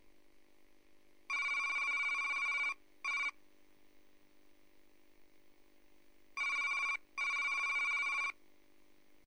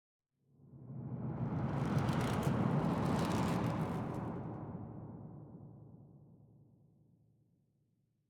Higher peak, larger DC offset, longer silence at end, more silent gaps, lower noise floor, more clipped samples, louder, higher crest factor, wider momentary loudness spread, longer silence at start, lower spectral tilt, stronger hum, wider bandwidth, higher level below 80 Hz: second, -28 dBFS vs -22 dBFS; neither; second, 0.95 s vs 1.85 s; neither; second, -69 dBFS vs -78 dBFS; neither; about the same, -35 LUFS vs -37 LUFS; second, 12 dB vs 18 dB; second, 6 LU vs 19 LU; first, 1.3 s vs 0.65 s; second, 1.5 dB/octave vs -7.5 dB/octave; neither; second, 16 kHz vs 18 kHz; second, -78 dBFS vs -60 dBFS